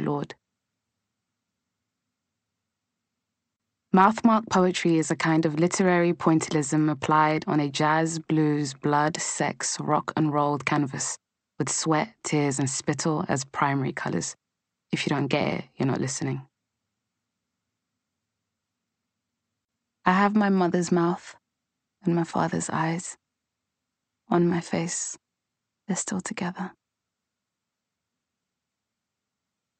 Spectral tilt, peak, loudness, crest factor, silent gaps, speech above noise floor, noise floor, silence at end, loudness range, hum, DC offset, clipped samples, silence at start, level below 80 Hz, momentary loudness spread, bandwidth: -5 dB/octave; -4 dBFS; -25 LUFS; 22 dB; none; 61 dB; -85 dBFS; 3.1 s; 11 LU; none; under 0.1%; under 0.1%; 0 s; -68 dBFS; 10 LU; 8.8 kHz